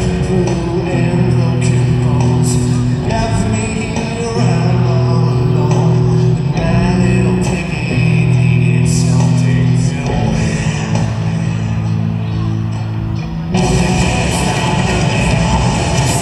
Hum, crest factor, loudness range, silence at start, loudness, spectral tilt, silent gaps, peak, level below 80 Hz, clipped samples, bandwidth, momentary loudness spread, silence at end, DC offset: none; 12 dB; 4 LU; 0 s; -14 LUFS; -6 dB/octave; none; -2 dBFS; -26 dBFS; under 0.1%; 12 kHz; 6 LU; 0 s; under 0.1%